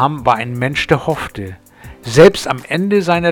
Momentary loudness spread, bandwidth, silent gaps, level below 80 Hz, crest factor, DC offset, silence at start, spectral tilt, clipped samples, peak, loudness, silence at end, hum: 18 LU; 18.5 kHz; none; -40 dBFS; 14 dB; under 0.1%; 0 s; -5.5 dB/octave; under 0.1%; 0 dBFS; -14 LUFS; 0 s; none